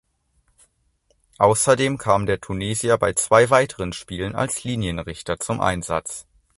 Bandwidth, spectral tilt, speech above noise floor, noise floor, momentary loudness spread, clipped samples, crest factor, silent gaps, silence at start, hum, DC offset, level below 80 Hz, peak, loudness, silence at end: 12 kHz; -4 dB/octave; 45 dB; -65 dBFS; 13 LU; under 0.1%; 22 dB; none; 1.4 s; none; under 0.1%; -46 dBFS; 0 dBFS; -21 LUFS; 0.35 s